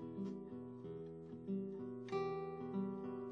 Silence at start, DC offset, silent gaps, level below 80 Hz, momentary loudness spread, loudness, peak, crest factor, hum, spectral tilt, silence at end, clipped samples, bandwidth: 0 s; under 0.1%; none; -76 dBFS; 8 LU; -46 LUFS; -30 dBFS; 14 dB; none; -8.5 dB/octave; 0 s; under 0.1%; 7.4 kHz